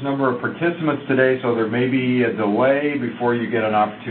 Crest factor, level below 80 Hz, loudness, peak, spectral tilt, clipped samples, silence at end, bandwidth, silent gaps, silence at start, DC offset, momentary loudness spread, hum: 18 dB; -62 dBFS; -20 LUFS; -2 dBFS; -11.5 dB/octave; under 0.1%; 0 s; 4.3 kHz; none; 0 s; under 0.1%; 5 LU; none